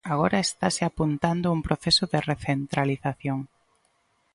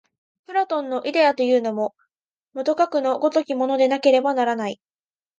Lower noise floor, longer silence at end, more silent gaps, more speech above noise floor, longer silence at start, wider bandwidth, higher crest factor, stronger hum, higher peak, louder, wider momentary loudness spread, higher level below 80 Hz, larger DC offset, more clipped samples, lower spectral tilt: second, -68 dBFS vs under -90 dBFS; first, 0.9 s vs 0.65 s; second, none vs 2.31-2.41 s; second, 43 dB vs over 70 dB; second, 0.05 s vs 0.5 s; first, 11.5 kHz vs 7.6 kHz; about the same, 20 dB vs 18 dB; neither; second, -8 dBFS vs -4 dBFS; second, -25 LUFS vs -21 LUFS; about the same, 9 LU vs 9 LU; first, -48 dBFS vs -78 dBFS; neither; neither; about the same, -4.5 dB/octave vs -4.5 dB/octave